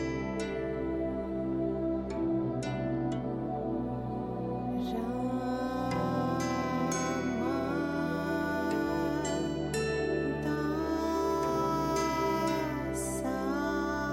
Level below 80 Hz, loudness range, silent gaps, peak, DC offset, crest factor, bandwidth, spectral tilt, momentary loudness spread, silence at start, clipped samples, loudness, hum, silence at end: -50 dBFS; 3 LU; none; -20 dBFS; under 0.1%; 12 dB; 16 kHz; -6 dB/octave; 4 LU; 0 s; under 0.1%; -32 LUFS; none; 0 s